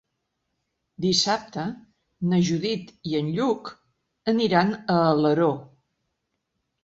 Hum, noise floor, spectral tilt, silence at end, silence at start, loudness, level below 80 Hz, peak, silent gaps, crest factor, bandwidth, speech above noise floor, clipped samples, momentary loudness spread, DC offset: none; -78 dBFS; -5.5 dB/octave; 1.2 s; 1 s; -24 LUFS; -62 dBFS; -6 dBFS; none; 20 dB; 8 kHz; 55 dB; under 0.1%; 12 LU; under 0.1%